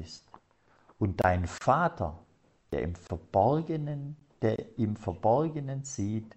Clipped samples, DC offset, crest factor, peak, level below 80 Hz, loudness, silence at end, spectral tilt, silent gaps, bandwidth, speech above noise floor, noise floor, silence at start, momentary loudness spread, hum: under 0.1%; under 0.1%; 20 dB; -10 dBFS; -52 dBFS; -30 LUFS; 0.1 s; -7 dB/octave; none; 8.4 kHz; 36 dB; -65 dBFS; 0 s; 11 LU; none